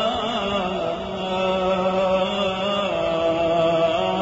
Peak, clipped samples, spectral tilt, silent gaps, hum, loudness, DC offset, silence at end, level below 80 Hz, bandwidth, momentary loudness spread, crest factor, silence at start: -8 dBFS; under 0.1%; -3 dB/octave; none; none; -22 LUFS; under 0.1%; 0 s; -48 dBFS; 7.6 kHz; 6 LU; 14 dB; 0 s